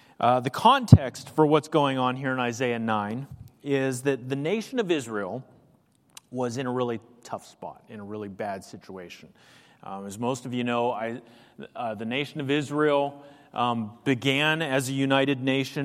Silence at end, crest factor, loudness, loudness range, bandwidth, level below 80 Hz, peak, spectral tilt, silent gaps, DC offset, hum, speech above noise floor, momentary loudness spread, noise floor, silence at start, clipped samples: 0 s; 26 dB; -25 LUFS; 11 LU; 15.5 kHz; -52 dBFS; 0 dBFS; -6 dB/octave; none; under 0.1%; none; 36 dB; 19 LU; -62 dBFS; 0.2 s; under 0.1%